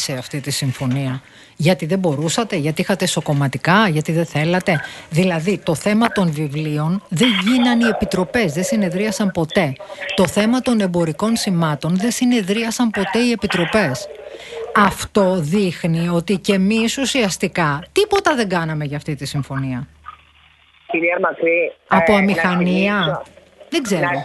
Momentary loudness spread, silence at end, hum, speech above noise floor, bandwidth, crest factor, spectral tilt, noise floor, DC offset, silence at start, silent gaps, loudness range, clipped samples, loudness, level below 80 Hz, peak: 8 LU; 0 s; none; 34 dB; 12.5 kHz; 18 dB; -5 dB/octave; -51 dBFS; under 0.1%; 0 s; none; 3 LU; under 0.1%; -18 LUFS; -48 dBFS; 0 dBFS